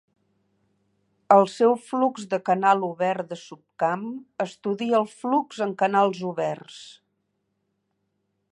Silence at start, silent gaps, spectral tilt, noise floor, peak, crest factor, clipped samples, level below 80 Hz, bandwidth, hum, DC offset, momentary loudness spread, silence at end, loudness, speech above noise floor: 1.3 s; none; -6 dB/octave; -75 dBFS; -4 dBFS; 22 dB; under 0.1%; -80 dBFS; 11 kHz; none; under 0.1%; 14 LU; 1.6 s; -23 LUFS; 52 dB